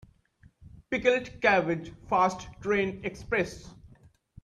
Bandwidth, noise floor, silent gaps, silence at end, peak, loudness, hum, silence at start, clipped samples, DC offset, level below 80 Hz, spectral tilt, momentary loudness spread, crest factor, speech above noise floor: 11.5 kHz; -61 dBFS; none; 0.55 s; -8 dBFS; -28 LUFS; none; 0.6 s; under 0.1%; under 0.1%; -54 dBFS; -5.5 dB/octave; 11 LU; 20 dB; 33 dB